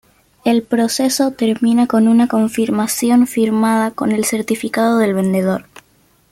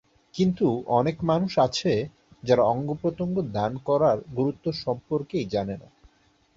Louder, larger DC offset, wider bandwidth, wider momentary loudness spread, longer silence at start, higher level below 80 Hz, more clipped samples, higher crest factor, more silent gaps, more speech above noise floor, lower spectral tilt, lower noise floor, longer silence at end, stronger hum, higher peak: first, -15 LUFS vs -25 LUFS; neither; first, 15.5 kHz vs 7.8 kHz; second, 5 LU vs 8 LU; about the same, 0.45 s vs 0.35 s; about the same, -58 dBFS vs -56 dBFS; neither; second, 12 dB vs 18 dB; neither; about the same, 40 dB vs 38 dB; second, -5 dB/octave vs -7 dB/octave; second, -55 dBFS vs -62 dBFS; about the same, 0.7 s vs 0.75 s; neither; about the same, -4 dBFS vs -6 dBFS